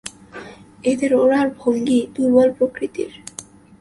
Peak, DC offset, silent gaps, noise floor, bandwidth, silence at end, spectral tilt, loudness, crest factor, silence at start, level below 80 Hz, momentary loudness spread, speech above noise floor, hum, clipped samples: -2 dBFS; under 0.1%; none; -40 dBFS; 11.5 kHz; 0.4 s; -5 dB/octave; -18 LUFS; 16 dB; 0.05 s; -56 dBFS; 21 LU; 23 dB; none; under 0.1%